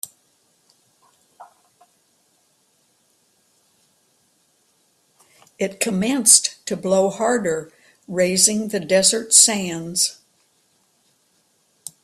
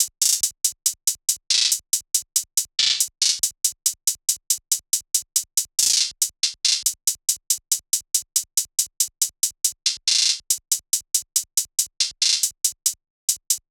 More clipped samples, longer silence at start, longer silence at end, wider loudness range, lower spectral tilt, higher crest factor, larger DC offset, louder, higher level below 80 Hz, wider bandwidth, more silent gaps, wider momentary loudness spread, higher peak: neither; about the same, 0.05 s vs 0 s; first, 1.9 s vs 0.15 s; first, 6 LU vs 1 LU; first, -2 dB/octave vs 5.5 dB/octave; about the same, 24 dB vs 20 dB; neither; first, -17 LUFS vs -20 LUFS; about the same, -64 dBFS vs -68 dBFS; second, 15.5 kHz vs over 20 kHz; second, none vs 13.10-13.28 s; first, 16 LU vs 5 LU; about the same, 0 dBFS vs -2 dBFS